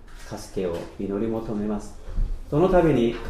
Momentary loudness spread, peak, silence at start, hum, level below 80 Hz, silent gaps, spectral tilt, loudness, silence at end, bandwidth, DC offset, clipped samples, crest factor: 16 LU; -8 dBFS; 0 s; none; -32 dBFS; none; -7.5 dB/octave; -25 LUFS; 0 s; 13.5 kHz; under 0.1%; under 0.1%; 16 dB